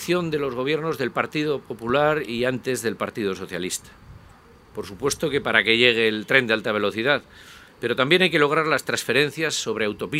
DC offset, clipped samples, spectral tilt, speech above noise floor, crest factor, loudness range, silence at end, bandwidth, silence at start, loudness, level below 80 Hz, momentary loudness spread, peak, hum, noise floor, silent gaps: under 0.1%; under 0.1%; -4 dB/octave; 27 dB; 22 dB; 6 LU; 0 s; 16 kHz; 0 s; -22 LUFS; -56 dBFS; 11 LU; 0 dBFS; none; -50 dBFS; none